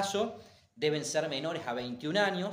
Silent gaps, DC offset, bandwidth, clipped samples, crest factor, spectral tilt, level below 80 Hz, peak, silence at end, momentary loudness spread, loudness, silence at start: none; under 0.1%; 15.5 kHz; under 0.1%; 20 dB; -4 dB/octave; -72 dBFS; -12 dBFS; 0 s; 7 LU; -33 LUFS; 0 s